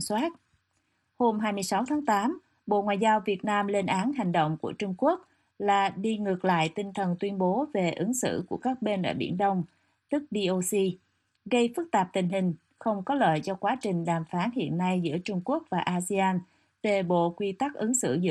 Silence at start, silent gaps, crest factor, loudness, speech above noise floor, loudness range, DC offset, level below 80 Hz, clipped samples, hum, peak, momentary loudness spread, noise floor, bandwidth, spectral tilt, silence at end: 0 s; none; 16 dB; -28 LUFS; 47 dB; 2 LU; under 0.1%; -70 dBFS; under 0.1%; none; -12 dBFS; 6 LU; -74 dBFS; 12.5 kHz; -5 dB/octave; 0 s